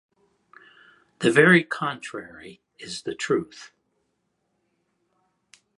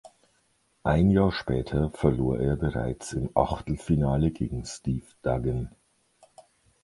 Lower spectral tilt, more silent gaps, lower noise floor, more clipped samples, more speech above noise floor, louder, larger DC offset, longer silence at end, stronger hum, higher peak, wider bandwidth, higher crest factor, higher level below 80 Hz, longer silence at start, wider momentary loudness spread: second, -5 dB/octave vs -7.5 dB/octave; neither; first, -74 dBFS vs -69 dBFS; neither; first, 51 dB vs 43 dB; first, -21 LUFS vs -27 LUFS; neither; first, 2.15 s vs 1.15 s; neither; first, -2 dBFS vs -6 dBFS; about the same, 11.5 kHz vs 11.5 kHz; about the same, 24 dB vs 22 dB; second, -70 dBFS vs -40 dBFS; first, 1.2 s vs 0.85 s; first, 26 LU vs 10 LU